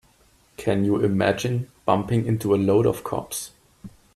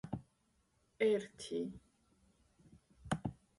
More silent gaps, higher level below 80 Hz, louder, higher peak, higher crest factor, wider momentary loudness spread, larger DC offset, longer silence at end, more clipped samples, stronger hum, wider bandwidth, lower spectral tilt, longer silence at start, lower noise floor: neither; first, -52 dBFS vs -66 dBFS; first, -23 LUFS vs -40 LUFS; first, -4 dBFS vs -22 dBFS; about the same, 20 dB vs 20 dB; second, 10 LU vs 17 LU; neither; about the same, 0.25 s vs 0.25 s; neither; neither; first, 13.5 kHz vs 11.5 kHz; about the same, -6.5 dB/octave vs -6 dB/octave; first, 0.6 s vs 0.05 s; second, -59 dBFS vs -77 dBFS